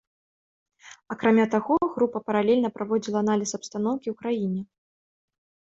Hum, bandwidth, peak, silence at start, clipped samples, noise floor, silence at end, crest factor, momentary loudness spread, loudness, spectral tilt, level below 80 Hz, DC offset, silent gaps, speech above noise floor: none; 8 kHz; -8 dBFS; 0.85 s; under 0.1%; under -90 dBFS; 1.15 s; 20 dB; 9 LU; -25 LUFS; -5.5 dB/octave; -66 dBFS; under 0.1%; none; over 66 dB